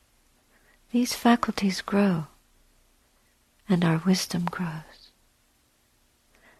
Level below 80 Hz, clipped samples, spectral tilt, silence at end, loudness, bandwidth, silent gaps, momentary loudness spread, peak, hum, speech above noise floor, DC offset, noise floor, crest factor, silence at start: -60 dBFS; under 0.1%; -5.5 dB/octave; 1.75 s; -25 LUFS; 14 kHz; none; 11 LU; -8 dBFS; none; 41 dB; under 0.1%; -66 dBFS; 20 dB; 0.95 s